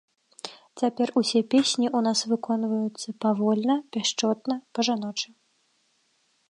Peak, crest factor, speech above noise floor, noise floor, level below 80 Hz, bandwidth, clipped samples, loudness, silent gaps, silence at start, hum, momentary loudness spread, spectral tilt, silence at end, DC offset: -10 dBFS; 16 dB; 44 dB; -69 dBFS; -80 dBFS; 11 kHz; under 0.1%; -25 LUFS; none; 0.45 s; none; 11 LU; -4 dB/octave; 1.25 s; under 0.1%